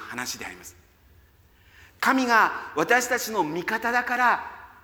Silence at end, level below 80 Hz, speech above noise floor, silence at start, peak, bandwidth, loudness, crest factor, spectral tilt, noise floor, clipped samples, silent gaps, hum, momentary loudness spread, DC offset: 0.15 s; -62 dBFS; 33 dB; 0 s; -6 dBFS; 19.5 kHz; -23 LUFS; 20 dB; -2.5 dB/octave; -57 dBFS; under 0.1%; none; none; 14 LU; under 0.1%